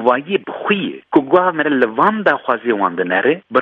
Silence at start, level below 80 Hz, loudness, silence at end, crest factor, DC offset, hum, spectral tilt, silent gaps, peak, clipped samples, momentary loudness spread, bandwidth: 0 s; -62 dBFS; -16 LUFS; 0 s; 16 dB; under 0.1%; none; -8 dB/octave; none; 0 dBFS; under 0.1%; 5 LU; 5.2 kHz